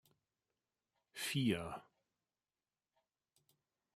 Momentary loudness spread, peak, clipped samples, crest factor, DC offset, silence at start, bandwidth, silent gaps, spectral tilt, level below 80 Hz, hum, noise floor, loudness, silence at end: 17 LU; -24 dBFS; under 0.1%; 22 dB; under 0.1%; 1.15 s; 16 kHz; none; -4.5 dB/octave; -76 dBFS; none; under -90 dBFS; -40 LUFS; 2.15 s